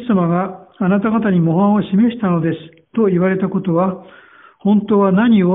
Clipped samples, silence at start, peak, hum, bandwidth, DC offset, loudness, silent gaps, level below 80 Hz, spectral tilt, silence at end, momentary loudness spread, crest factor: under 0.1%; 0 s; -2 dBFS; none; 3.9 kHz; under 0.1%; -16 LUFS; none; -54 dBFS; -8 dB/octave; 0 s; 9 LU; 12 dB